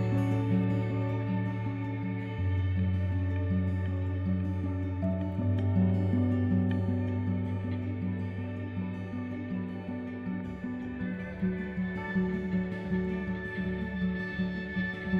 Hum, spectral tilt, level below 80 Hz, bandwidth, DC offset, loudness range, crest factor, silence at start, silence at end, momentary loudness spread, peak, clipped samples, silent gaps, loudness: none; -9.5 dB/octave; -50 dBFS; 4.8 kHz; under 0.1%; 6 LU; 14 dB; 0 s; 0 s; 8 LU; -16 dBFS; under 0.1%; none; -32 LUFS